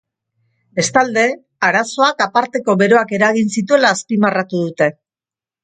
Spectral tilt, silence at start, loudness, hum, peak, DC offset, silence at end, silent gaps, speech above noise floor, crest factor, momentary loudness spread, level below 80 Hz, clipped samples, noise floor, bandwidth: -4 dB/octave; 0.75 s; -15 LUFS; none; 0 dBFS; under 0.1%; 0.75 s; none; over 75 dB; 16 dB; 6 LU; -62 dBFS; under 0.1%; under -90 dBFS; 9.4 kHz